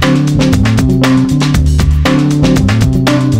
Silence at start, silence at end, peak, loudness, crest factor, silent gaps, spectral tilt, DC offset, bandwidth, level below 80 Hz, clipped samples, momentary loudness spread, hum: 0 s; 0 s; 0 dBFS; -10 LUFS; 8 dB; none; -6.5 dB/octave; under 0.1%; 16 kHz; -18 dBFS; under 0.1%; 1 LU; none